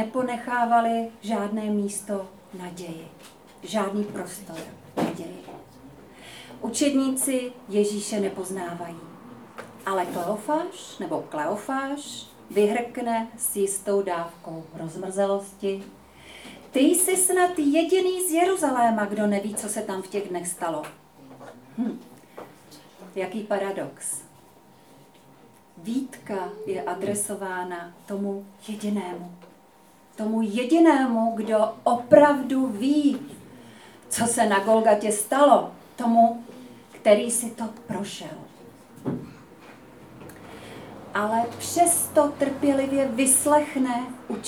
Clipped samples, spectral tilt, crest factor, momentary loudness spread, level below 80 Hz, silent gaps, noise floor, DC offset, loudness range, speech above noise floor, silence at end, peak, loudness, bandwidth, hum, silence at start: under 0.1%; -4 dB/octave; 24 dB; 22 LU; -68 dBFS; none; -54 dBFS; under 0.1%; 12 LU; 30 dB; 0 s; -2 dBFS; -24 LUFS; over 20 kHz; none; 0 s